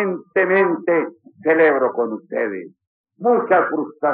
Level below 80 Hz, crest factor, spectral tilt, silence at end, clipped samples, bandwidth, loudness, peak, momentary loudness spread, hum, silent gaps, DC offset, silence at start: -84 dBFS; 14 dB; -5 dB/octave; 0 s; under 0.1%; 4.1 kHz; -18 LUFS; -4 dBFS; 10 LU; none; 2.87-3.04 s; under 0.1%; 0 s